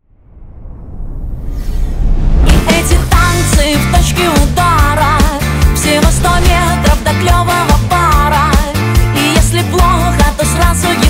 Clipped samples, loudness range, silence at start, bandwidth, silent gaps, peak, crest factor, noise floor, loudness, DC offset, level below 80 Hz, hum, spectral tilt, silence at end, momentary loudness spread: under 0.1%; 2 LU; 0.35 s; 16.5 kHz; none; 0 dBFS; 10 dB; -35 dBFS; -10 LUFS; under 0.1%; -14 dBFS; none; -4.5 dB/octave; 0 s; 11 LU